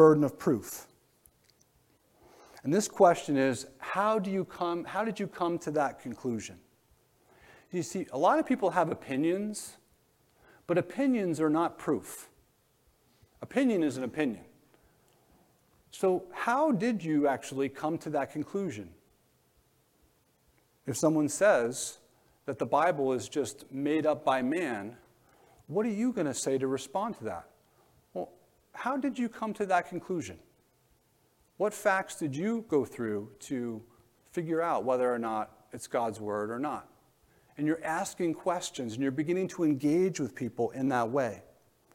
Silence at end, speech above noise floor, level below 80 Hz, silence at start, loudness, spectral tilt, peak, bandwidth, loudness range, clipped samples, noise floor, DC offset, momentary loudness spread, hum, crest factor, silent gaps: 0.55 s; 39 dB; -72 dBFS; 0 s; -31 LUFS; -5.5 dB/octave; -8 dBFS; 16.5 kHz; 5 LU; under 0.1%; -69 dBFS; under 0.1%; 13 LU; none; 24 dB; none